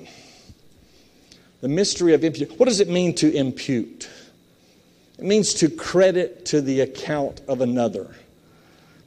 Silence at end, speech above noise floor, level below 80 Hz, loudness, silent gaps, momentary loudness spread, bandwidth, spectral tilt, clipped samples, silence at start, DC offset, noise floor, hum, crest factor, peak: 0.95 s; 35 dB; -58 dBFS; -21 LUFS; none; 13 LU; 13 kHz; -4.5 dB/octave; under 0.1%; 0 s; under 0.1%; -55 dBFS; none; 18 dB; -4 dBFS